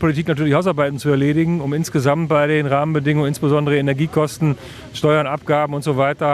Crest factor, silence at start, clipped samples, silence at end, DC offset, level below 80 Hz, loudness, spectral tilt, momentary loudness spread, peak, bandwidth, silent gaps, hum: 14 dB; 0 s; under 0.1%; 0 s; under 0.1%; -50 dBFS; -18 LUFS; -7 dB/octave; 4 LU; -2 dBFS; 14 kHz; none; none